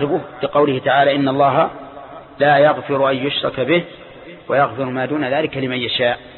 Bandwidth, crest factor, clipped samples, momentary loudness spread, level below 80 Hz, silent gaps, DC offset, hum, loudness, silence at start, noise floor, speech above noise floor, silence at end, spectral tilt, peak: 4.3 kHz; 14 dB; under 0.1%; 20 LU; -54 dBFS; none; under 0.1%; none; -17 LUFS; 0 s; -36 dBFS; 19 dB; 0 s; -10.5 dB/octave; -2 dBFS